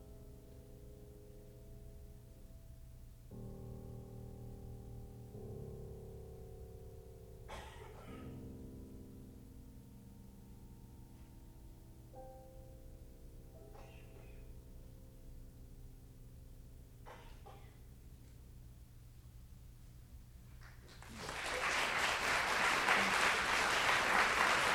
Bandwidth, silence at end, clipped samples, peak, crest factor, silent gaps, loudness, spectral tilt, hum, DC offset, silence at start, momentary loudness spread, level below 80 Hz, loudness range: over 20 kHz; 0 s; under 0.1%; -18 dBFS; 26 dB; none; -34 LUFS; -2.5 dB/octave; none; under 0.1%; 0 s; 27 LU; -56 dBFS; 24 LU